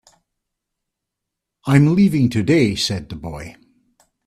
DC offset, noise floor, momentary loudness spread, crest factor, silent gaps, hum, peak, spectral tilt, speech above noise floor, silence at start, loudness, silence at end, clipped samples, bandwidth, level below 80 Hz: under 0.1%; -82 dBFS; 17 LU; 20 dB; none; none; 0 dBFS; -6.5 dB/octave; 65 dB; 1.65 s; -16 LUFS; 0.75 s; under 0.1%; 14 kHz; -48 dBFS